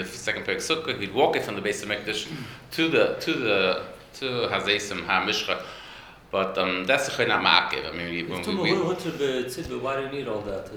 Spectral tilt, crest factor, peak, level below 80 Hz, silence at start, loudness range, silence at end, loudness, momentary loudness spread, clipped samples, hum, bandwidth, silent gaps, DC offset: -3.5 dB/octave; 26 dB; 0 dBFS; -56 dBFS; 0 s; 2 LU; 0 s; -25 LUFS; 10 LU; under 0.1%; none; over 20 kHz; none; under 0.1%